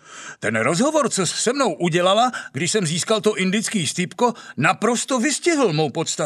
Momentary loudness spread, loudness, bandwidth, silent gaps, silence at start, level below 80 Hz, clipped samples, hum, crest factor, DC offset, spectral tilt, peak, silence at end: 4 LU; -20 LUFS; 14 kHz; none; 0.1 s; -72 dBFS; under 0.1%; none; 18 dB; under 0.1%; -3.5 dB/octave; -2 dBFS; 0 s